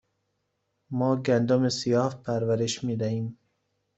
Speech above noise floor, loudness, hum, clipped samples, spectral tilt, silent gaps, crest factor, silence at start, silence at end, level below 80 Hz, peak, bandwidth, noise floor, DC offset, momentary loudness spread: 52 dB; -26 LUFS; none; under 0.1%; -6 dB/octave; none; 16 dB; 0.9 s; 0.65 s; -66 dBFS; -10 dBFS; 8.2 kHz; -77 dBFS; under 0.1%; 8 LU